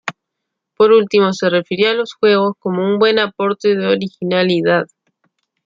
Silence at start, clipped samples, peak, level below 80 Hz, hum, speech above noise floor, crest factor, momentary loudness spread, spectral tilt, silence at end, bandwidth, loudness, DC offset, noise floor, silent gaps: 0.05 s; under 0.1%; -2 dBFS; -64 dBFS; none; 64 dB; 14 dB; 7 LU; -6 dB/octave; 0.8 s; 7.6 kHz; -15 LUFS; under 0.1%; -78 dBFS; none